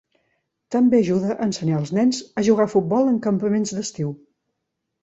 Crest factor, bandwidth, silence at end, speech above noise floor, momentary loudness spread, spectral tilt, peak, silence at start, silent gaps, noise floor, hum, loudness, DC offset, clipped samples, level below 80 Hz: 16 dB; 8 kHz; 0.85 s; 59 dB; 9 LU; -6.5 dB/octave; -6 dBFS; 0.7 s; none; -79 dBFS; none; -21 LUFS; under 0.1%; under 0.1%; -62 dBFS